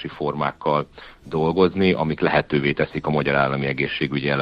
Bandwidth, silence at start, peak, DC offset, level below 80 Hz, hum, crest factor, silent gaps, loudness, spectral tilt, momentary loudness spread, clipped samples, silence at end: 5.8 kHz; 0 s; -4 dBFS; under 0.1%; -48 dBFS; none; 18 dB; none; -21 LUFS; -8.5 dB/octave; 6 LU; under 0.1%; 0 s